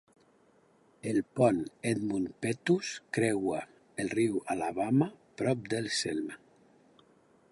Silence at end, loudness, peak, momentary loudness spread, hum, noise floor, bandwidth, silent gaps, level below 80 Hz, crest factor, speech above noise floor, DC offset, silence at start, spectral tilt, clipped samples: 1.15 s; -32 LUFS; -12 dBFS; 10 LU; none; -65 dBFS; 11.5 kHz; none; -68 dBFS; 20 dB; 35 dB; under 0.1%; 1.05 s; -5.5 dB/octave; under 0.1%